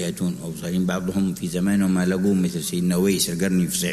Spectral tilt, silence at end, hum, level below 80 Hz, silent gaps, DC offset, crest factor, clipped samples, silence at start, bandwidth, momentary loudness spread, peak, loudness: -5 dB/octave; 0 s; none; -50 dBFS; none; under 0.1%; 14 dB; under 0.1%; 0 s; 13.5 kHz; 6 LU; -8 dBFS; -22 LUFS